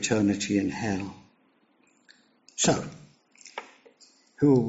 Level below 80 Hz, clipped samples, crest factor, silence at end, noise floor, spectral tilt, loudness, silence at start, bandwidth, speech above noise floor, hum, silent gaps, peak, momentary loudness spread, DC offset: -60 dBFS; under 0.1%; 20 dB; 0 s; -65 dBFS; -5.5 dB/octave; -26 LUFS; 0 s; 8 kHz; 41 dB; none; none; -8 dBFS; 17 LU; under 0.1%